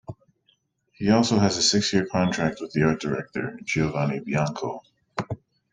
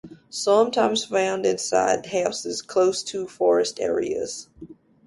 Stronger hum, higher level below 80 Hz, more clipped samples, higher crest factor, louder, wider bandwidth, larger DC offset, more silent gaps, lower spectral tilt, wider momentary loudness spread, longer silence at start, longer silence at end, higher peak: neither; first, -54 dBFS vs -62 dBFS; neither; about the same, 18 dB vs 16 dB; about the same, -24 LUFS vs -23 LUFS; second, 9.6 kHz vs 11.5 kHz; neither; neither; first, -4.5 dB/octave vs -3 dB/octave; first, 15 LU vs 10 LU; about the same, 0.1 s vs 0.05 s; about the same, 0.35 s vs 0.35 s; about the same, -6 dBFS vs -6 dBFS